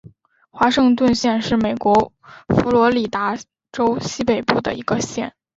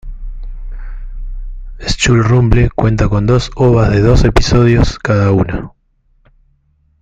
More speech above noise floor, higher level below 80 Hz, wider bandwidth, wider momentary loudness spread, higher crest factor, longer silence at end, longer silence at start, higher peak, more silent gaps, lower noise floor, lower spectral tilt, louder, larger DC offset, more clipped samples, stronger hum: second, 33 dB vs 45 dB; second, -46 dBFS vs -20 dBFS; second, 7.8 kHz vs 9 kHz; second, 9 LU vs 21 LU; first, 18 dB vs 12 dB; second, 0.3 s vs 1.35 s; first, 0.55 s vs 0.05 s; about the same, -2 dBFS vs 0 dBFS; neither; second, -51 dBFS vs -55 dBFS; second, -5 dB/octave vs -6.5 dB/octave; second, -18 LUFS vs -12 LUFS; neither; neither; neither